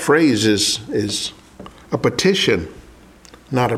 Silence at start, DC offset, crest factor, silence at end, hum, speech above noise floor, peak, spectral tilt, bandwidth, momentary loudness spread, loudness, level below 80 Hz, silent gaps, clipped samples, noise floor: 0 s; under 0.1%; 16 dB; 0 s; none; 27 dB; -2 dBFS; -4 dB/octave; 15.5 kHz; 11 LU; -18 LUFS; -48 dBFS; none; under 0.1%; -45 dBFS